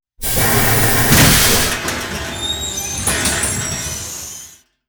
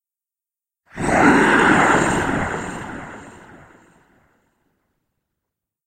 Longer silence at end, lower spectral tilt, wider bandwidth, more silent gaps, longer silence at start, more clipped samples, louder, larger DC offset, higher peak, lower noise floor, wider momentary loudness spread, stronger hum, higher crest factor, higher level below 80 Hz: second, 0.4 s vs 2.55 s; second, -2.5 dB/octave vs -5 dB/octave; first, over 20 kHz vs 16 kHz; neither; second, 0.2 s vs 0.95 s; neither; about the same, -14 LUFS vs -16 LUFS; neither; about the same, 0 dBFS vs 0 dBFS; second, -40 dBFS vs -89 dBFS; second, 15 LU vs 20 LU; neither; about the same, 16 dB vs 20 dB; first, -30 dBFS vs -44 dBFS